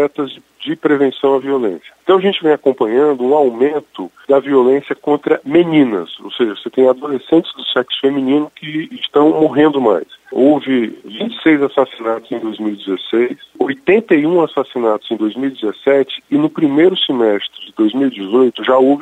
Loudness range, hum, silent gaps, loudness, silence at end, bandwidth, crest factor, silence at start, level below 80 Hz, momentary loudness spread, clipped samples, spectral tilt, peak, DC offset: 2 LU; none; none; -15 LUFS; 0 s; 8.2 kHz; 14 dB; 0 s; -64 dBFS; 10 LU; under 0.1%; -7 dB/octave; 0 dBFS; under 0.1%